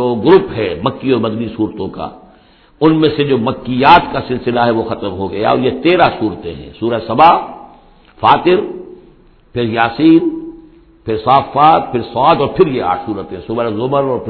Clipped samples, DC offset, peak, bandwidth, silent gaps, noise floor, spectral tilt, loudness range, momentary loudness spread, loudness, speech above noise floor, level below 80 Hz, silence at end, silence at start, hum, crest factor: 0.2%; under 0.1%; 0 dBFS; 5.4 kHz; none; -46 dBFS; -9 dB/octave; 2 LU; 14 LU; -13 LUFS; 34 dB; -42 dBFS; 0 s; 0 s; none; 14 dB